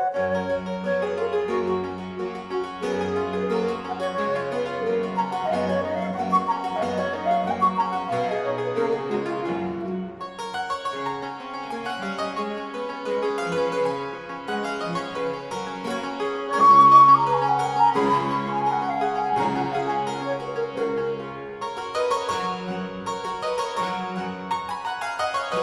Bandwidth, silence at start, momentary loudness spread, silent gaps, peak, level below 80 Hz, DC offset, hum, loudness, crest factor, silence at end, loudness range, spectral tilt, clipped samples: 12 kHz; 0 s; 10 LU; none; -4 dBFS; -62 dBFS; under 0.1%; none; -24 LUFS; 20 dB; 0 s; 10 LU; -5.5 dB/octave; under 0.1%